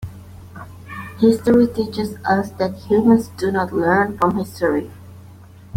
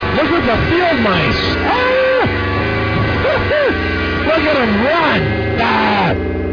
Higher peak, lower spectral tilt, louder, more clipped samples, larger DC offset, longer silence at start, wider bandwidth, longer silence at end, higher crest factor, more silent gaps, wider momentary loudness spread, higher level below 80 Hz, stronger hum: about the same, -2 dBFS vs -2 dBFS; about the same, -7 dB/octave vs -7 dB/octave; second, -18 LUFS vs -14 LUFS; neither; neither; about the same, 0 s vs 0 s; first, 16 kHz vs 5.4 kHz; about the same, 0 s vs 0 s; about the same, 16 dB vs 12 dB; neither; first, 21 LU vs 4 LU; second, -48 dBFS vs -30 dBFS; neither